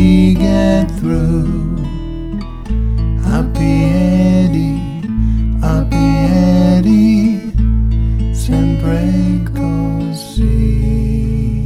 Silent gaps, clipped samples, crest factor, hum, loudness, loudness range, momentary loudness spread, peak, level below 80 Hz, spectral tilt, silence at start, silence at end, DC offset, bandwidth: none; under 0.1%; 12 dB; none; -14 LUFS; 3 LU; 10 LU; 0 dBFS; -18 dBFS; -8 dB/octave; 0 s; 0 s; under 0.1%; 12.5 kHz